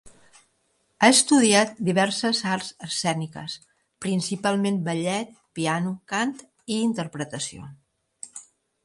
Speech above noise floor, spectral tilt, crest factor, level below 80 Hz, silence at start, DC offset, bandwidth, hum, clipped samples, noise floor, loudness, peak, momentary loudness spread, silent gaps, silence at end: 46 dB; -3.5 dB/octave; 20 dB; -66 dBFS; 0.05 s; under 0.1%; 11.5 kHz; none; under 0.1%; -69 dBFS; -23 LUFS; -4 dBFS; 22 LU; none; 0.4 s